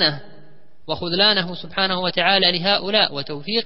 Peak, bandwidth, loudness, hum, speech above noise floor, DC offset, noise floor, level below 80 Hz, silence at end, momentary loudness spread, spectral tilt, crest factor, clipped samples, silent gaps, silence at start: -2 dBFS; 5.8 kHz; -18 LUFS; none; 31 dB; 2%; -51 dBFS; -56 dBFS; 0 s; 12 LU; -8.5 dB/octave; 20 dB; under 0.1%; none; 0 s